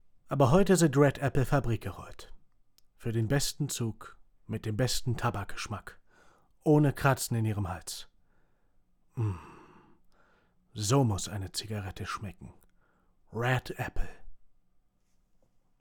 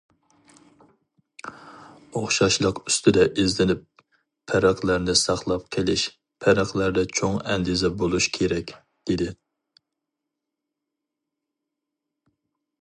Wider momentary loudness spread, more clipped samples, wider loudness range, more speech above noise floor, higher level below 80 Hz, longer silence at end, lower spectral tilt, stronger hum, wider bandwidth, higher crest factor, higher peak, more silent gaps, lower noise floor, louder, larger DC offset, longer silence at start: first, 18 LU vs 12 LU; neither; about the same, 9 LU vs 9 LU; second, 40 dB vs 62 dB; about the same, -46 dBFS vs -48 dBFS; second, 1.35 s vs 3.45 s; first, -5.5 dB/octave vs -4 dB/octave; neither; first, over 20 kHz vs 11.5 kHz; about the same, 20 dB vs 22 dB; second, -10 dBFS vs -4 dBFS; neither; second, -69 dBFS vs -84 dBFS; second, -30 LUFS vs -23 LUFS; neither; second, 0.25 s vs 1.45 s